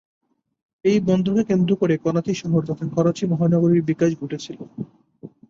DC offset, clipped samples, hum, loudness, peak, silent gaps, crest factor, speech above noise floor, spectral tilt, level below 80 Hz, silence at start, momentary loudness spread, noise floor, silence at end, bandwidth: under 0.1%; under 0.1%; none; -20 LUFS; -6 dBFS; none; 16 dB; 24 dB; -7.5 dB/octave; -58 dBFS; 0.85 s; 15 LU; -44 dBFS; 0.2 s; 7.6 kHz